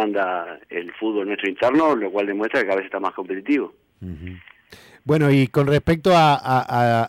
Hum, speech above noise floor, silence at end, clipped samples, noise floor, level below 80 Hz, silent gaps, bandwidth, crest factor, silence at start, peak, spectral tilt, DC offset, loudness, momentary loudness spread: none; 28 dB; 0 s; under 0.1%; -48 dBFS; -50 dBFS; none; 15.5 kHz; 14 dB; 0 s; -8 dBFS; -7 dB/octave; under 0.1%; -20 LUFS; 18 LU